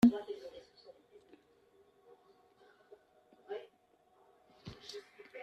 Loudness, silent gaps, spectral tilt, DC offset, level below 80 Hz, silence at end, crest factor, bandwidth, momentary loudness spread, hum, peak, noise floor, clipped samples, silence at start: -41 LUFS; none; -6.5 dB/octave; under 0.1%; -74 dBFS; 0 s; 26 dB; 13.5 kHz; 18 LU; none; -14 dBFS; -71 dBFS; under 0.1%; 0 s